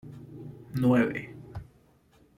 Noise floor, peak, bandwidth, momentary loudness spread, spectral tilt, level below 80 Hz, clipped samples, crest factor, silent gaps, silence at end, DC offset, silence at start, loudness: -62 dBFS; -12 dBFS; 14 kHz; 21 LU; -8.5 dB/octave; -58 dBFS; under 0.1%; 20 dB; none; 0.75 s; under 0.1%; 0.05 s; -27 LUFS